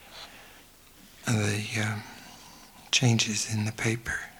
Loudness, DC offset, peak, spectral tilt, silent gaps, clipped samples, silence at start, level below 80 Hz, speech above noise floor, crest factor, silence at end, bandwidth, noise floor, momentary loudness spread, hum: -28 LUFS; under 0.1%; -8 dBFS; -3.5 dB/octave; none; under 0.1%; 0 s; -56 dBFS; 25 dB; 22 dB; 0.05 s; over 20 kHz; -54 dBFS; 24 LU; none